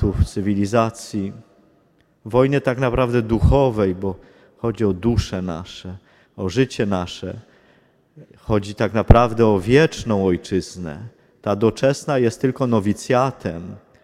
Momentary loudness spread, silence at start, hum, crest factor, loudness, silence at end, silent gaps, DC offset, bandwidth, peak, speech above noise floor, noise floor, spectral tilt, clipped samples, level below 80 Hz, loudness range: 16 LU; 0 s; none; 20 dB; -20 LUFS; 0.25 s; none; under 0.1%; 13.5 kHz; 0 dBFS; 40 dB; -59 dBFS; -7 dB/octave; under 0.1%; -32 dBFS; 6 LU